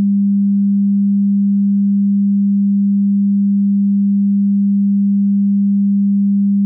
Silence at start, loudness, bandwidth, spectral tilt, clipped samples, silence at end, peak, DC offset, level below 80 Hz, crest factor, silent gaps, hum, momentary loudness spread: 0 s; -14 LUFS; 0.3 kHz; -17 dB/octave; under 0.1%; 0 s; -10 dBFS; under 0.1%; -72 dBFS; 4 dB; none; none; 0 LU